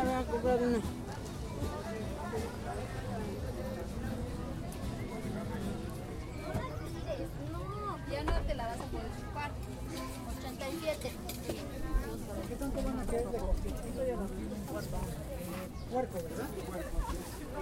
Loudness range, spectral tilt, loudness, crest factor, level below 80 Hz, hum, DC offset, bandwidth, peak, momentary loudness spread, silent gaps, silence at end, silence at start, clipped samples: 2 LU; -6 dB/octave; -38 LUFS; 18 dB; -42 dBFS; none; under 0.1%; 16 kHz; -18 dBFS; 6 LU; none; 0 s; 0 s; under 0.1%